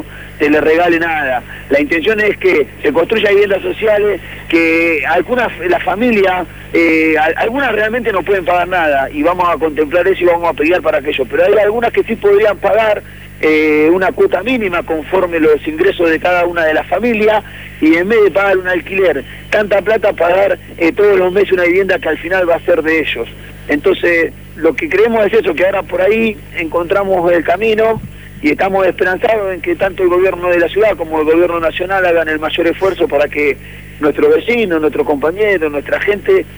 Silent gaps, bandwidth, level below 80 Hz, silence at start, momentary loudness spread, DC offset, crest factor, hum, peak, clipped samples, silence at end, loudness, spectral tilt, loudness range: none; over 20 kHz; -38 dBFS; 0 s; 6 LU; 0.4%; 10 dB; 50 Hz at -35 dBFS; -2 dBFS; under 0.1%; 0 s; -13 LUFS; -6 dB/octave; 1 LU